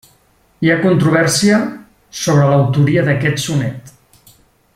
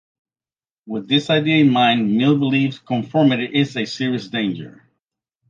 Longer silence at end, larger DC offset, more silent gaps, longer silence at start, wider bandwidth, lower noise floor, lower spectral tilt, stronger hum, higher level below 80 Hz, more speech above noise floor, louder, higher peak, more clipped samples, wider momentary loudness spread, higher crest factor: about the same, 0.85 s vs 0.8 s; neither; neither; second, 0.6 s vs 0.85 s; first, 15 kHz vs 7.6 kHz; second, -54 dBFS vs under -90 dBFS; about the same, -5.5 dB/octave vs -6.5 dB/octave; neither; first, -50 dBFS vs -64 dBFS; second, 41 dB vs over 72 dB; first, -14 LUFS vs -18 LUFS; about the same, -2 dBFS vs -2 dBFS; neither; about the same, 12 LU vs 10 LU; about the same, 14 dB vs 16 dB